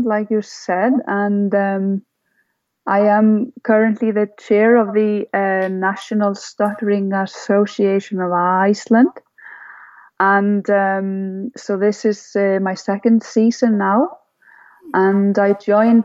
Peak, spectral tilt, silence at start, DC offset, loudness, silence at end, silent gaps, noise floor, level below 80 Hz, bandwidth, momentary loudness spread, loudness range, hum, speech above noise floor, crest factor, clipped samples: -2 dBFS; -7 dB/octave; 0 s; under 0.1%; -17 LUFS; 0 s; none; -67 dBFS; -74 dBFS; 7.8 kHz; 8 LU; 2 LU; none; 51 dB; 14 dB; under 0.1%